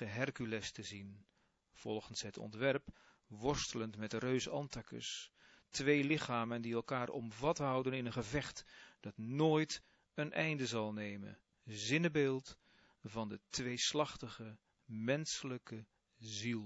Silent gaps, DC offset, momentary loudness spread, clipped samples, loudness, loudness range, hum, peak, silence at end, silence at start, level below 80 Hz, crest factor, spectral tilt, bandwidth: none; under 0.1%; 18 LU; under 0.1%; -40 LUFS; 4 LU; none; -20 dBFS; 0 s; 0 s; -66 dBFS; 22 dB; -4 dB/octave; 7.6 kHz